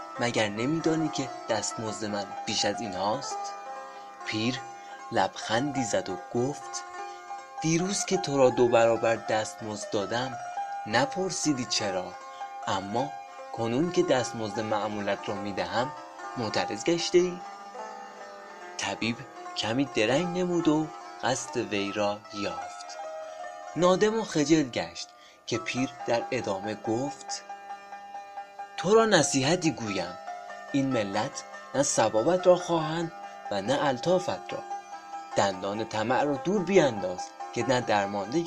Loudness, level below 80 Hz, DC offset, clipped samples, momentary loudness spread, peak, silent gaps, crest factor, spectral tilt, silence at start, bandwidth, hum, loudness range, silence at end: -28 LUFS; -62 dBFS; under 0.1%; under 0.1%; 17 LU; -4 dBFS; none; 24 dB; -4 dB/octave; 0 s; 12 kHz; none; 5 LU; 0 s